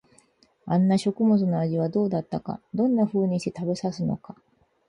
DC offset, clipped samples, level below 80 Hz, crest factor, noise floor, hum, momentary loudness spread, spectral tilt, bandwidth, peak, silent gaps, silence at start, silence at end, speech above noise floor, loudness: under 0.1%; under 0.1%; -62 dBFS; 14 dB; -61 dBFS; none; 11 LU; -8 dB/octave; 11 kHz; -12 dBFS; none; 0.65 s; 0.55 s; 37 dB; -25 LUFS